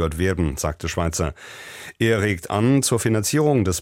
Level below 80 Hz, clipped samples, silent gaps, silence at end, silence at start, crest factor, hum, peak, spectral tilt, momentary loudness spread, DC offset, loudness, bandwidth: -38 dBFS; under 0.1%; none; 0 s; 0 s; 14 dB; none; -6 dBFS; -5 dB/octave; 14 LU; under 0.1%; -21 LUFS; 16.5 kHz